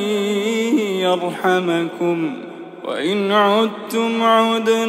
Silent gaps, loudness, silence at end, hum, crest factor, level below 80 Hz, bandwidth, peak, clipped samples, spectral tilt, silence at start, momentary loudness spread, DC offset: none; -18 LUFS; 0 s; none; 16 dB; -80 dBFS; 16 kHz; -2 dBFS; under 0.1%; -5 dB/octave; 0 s; 10 LU; under 0.1%